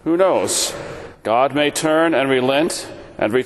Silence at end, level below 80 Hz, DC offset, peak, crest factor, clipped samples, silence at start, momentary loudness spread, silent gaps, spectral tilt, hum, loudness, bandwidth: 0 s; -52 dBFS; under 0.1%; -2 dBFS; 16 dB; under 0.1%; 0.05 s; 13 LU; none; -3.5 dB/octave; none; -17 LUFS; 12.5 kHz